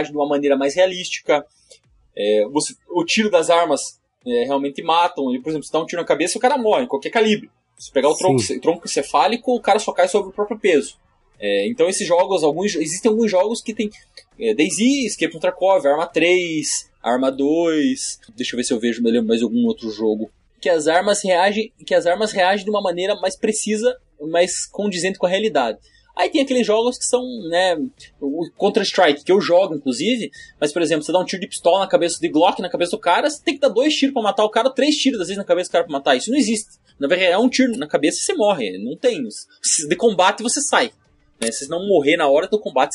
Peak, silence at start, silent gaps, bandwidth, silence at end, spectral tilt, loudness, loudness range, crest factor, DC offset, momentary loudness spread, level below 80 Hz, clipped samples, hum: -2 dBFS; 0 s; none; 11.5 kHz; 0 s; -3 dB/octave; -19 LUFS; 2 LU; 18 dB; under 0.1%; 8 LU; -60 dBFS; under 0.1%; none